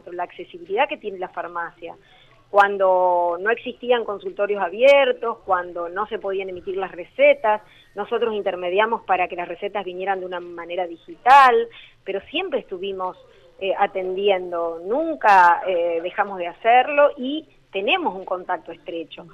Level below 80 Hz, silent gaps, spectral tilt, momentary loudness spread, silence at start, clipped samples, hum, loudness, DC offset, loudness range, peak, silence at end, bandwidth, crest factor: -60 dBFS; none; -4.5 dB/octave; 16 LU; 0.05 s; under 0.1%; none; -21 LUFS; under 0.1%; 5 LU; -4 dBFS; 0.05 s; 9.6 kHz; 18 dB